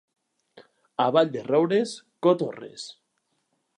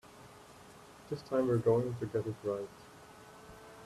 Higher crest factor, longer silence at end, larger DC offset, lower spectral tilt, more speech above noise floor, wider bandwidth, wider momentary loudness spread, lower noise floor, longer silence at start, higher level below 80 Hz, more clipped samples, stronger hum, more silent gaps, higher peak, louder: about the same, 20 dB vs 20 dB; first, 0.85 s vs 0 s; neither; second, -6 dB/octave vs -8 dB/octave; first, 51 dB vs 22 dB; second, 10.5 kHz vs 14 kHz; second, 17 LU vs 25 LU; first, -75 dBFS vs -55 dBFS; first, 1 s vs 0.05 s; second, -80 dBFS vs -66 dBFS; neither; neither; neither; first, -6 dBFS vs -18 dBFS; first, -24 LUFS vs -34 LUFS